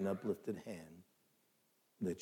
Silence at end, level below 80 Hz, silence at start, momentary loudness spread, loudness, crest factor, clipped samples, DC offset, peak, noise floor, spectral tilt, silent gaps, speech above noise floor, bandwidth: 0 s; -82 dBFS; 0 s; 18 LU; -44 LUFS; 18 dB; under 0.1%; under 0.1%; -26 dBFS; -77 dBFS; -7.5 dB/octave; none; 35 dB; 18.5 kHz